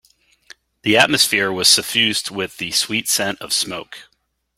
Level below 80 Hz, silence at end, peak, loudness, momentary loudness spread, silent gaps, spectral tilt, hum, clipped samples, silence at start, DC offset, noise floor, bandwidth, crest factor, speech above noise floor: -58 dBFS; 0.55 s; 0 dBFS; -16 LUFS; 12 LU; none; -1.5 dB/octave; none; under 0.1%; 0.85 s; under 0.1%; -48 dBFS; 16.5 kHz; 20 dB; 30 dB